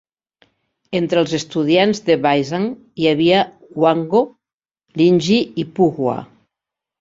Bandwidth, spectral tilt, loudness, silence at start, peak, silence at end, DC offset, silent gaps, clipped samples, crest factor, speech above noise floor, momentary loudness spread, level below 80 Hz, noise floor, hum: 7.8 kHz; -6 dB/octave; -17 LUFS; 0.9 s; -2 dBFS; 0.75 s; under 0.1%; 4.54-4.60 s; under 0.1%; 16 dB; 72 dB; 10 LU; -58 dBFS; -88 dBFS; none